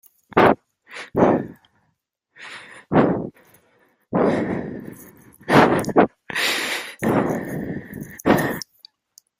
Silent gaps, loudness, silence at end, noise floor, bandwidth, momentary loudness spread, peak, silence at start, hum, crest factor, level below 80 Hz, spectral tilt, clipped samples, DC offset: none; -20 LUFS; 0.75 s; -72 dBFS; 16 kHz; 21 LU; -2 dBFS; 0.35 s; none; 22 dB; -52 dBFS; -5.5 dB/octave; under 0.1%; under 0.1%